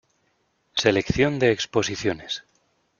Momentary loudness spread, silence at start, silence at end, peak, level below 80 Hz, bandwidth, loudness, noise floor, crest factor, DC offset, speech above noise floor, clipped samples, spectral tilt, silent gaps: 11 LU; 0.75 s; 0.6 s; -2 dBFS; -48 dBFS; 7.4 kHz; -23 LUFS; -69 dBFS; 22 dB; under 0.1%; 46 dB; under 0.1%; -4.5 dB/octave; none